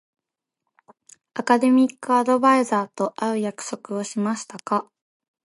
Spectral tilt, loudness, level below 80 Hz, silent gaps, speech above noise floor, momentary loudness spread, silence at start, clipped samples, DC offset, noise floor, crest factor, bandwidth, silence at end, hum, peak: -5 dB/octave; -22 LUFS; -78 dBFS; none; 64 dB; 13 LU; 1.35 s; under 0.1%; under 0.1%; -86 dBFS; 20 dB; 11.5 kHz; 0.65 s; none; -4 dBFS